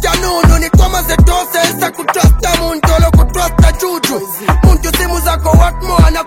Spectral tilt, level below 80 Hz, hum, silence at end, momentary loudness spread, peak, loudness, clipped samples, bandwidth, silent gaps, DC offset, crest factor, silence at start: -5 dB/octave; -12 dBFS; none; 0 s; 5 LU; 0 dBFS; -11 LUFS; 0.4%; 17 kHz; none; under 0.1%; 10 dB; 0 s